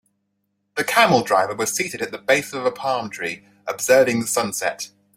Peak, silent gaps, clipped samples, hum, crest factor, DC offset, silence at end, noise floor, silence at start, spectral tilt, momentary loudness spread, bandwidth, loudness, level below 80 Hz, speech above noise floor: 0 dBFS; none; under 0.1%; none; 20 dB; under 0.1%; 0.3 s; -73 dBFS; 0.75 s; -3 dB/octave; 13 LU; 16.5 kHz; -20 LUFS; -64 dBFS; 52 dB